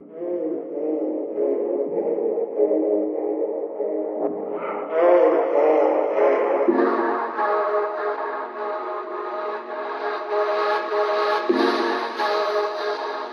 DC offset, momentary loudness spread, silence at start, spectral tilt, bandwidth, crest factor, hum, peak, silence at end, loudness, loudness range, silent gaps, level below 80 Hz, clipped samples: under 0.1%; 10 LU; 0 s; -5 dB/octave; 6.8 kHz; 16 dB; none; -6 dBFS; 0 s; -23 LUFS; 6 LU; none; -88 dBFS; under 0.1%